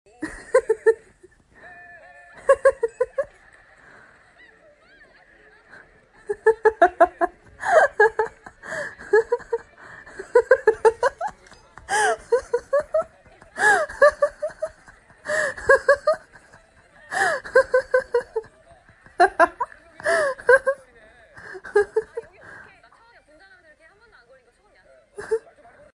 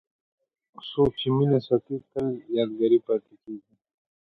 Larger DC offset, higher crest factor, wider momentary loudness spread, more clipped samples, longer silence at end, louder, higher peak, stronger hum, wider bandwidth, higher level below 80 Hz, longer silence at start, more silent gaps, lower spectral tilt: neither; about the same, 20 dB vs 18 dB; about the same, 19 LU vs 19 LU; neither; about the same, 0.55 s vs 0.65 s; first, -21 LUFS vs -25 LUFS; first, -4 dBFS vs -8 dBFS; neither; first, 11.5 kHz vs 4.8 kHz; about the same, -56 dBFS vs -56 dBFS; second, 0.2 s vs 0.85 s; neither; second, -3 dB/octave vs -9.5 dB/octave